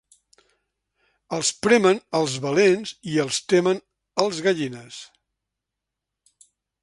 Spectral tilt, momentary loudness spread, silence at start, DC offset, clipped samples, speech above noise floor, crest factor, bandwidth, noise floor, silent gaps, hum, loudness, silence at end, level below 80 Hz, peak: -4 dB/octave; 13 LU; 1.3 s; under 0.1%; under 0.1%; 63 dB; 22 dB; 11.5 kHz; -84 dBFS; none; none; -22 LUFS; 1.8 s; -66 dBFS; -4 dBFS